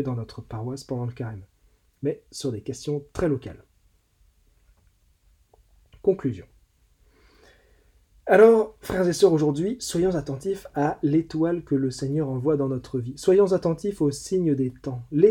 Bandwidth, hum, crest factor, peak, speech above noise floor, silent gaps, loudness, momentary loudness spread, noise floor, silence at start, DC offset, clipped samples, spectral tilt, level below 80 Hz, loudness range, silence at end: 16.5 kHz; none; 22 dB; -4 dBFS; 40 dB; none; -24 LUFS; 14 LU; -63 dBFS; 0 s; under 0.1%; under 0.1%; -6.5 dB/octave; -52 dBFS; 12 LU; 0 s